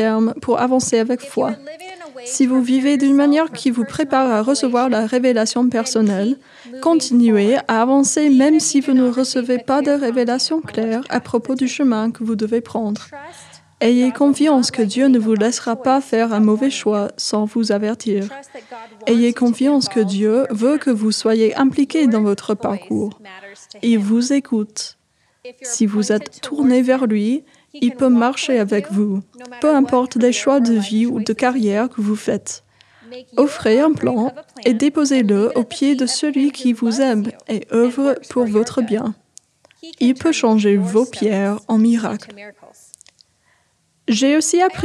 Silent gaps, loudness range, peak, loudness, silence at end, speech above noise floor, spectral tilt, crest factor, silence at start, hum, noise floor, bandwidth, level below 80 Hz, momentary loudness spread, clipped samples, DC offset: none; 4 LU; -2 dBFS; -17 LUFS; 0 s; 46 dB; -4.5 dB/octave; 16 dB; 0 s; none; -62 dBFS; 12 kHz; -64 dBFS; 10 LU; under 0.1%; under 0.1%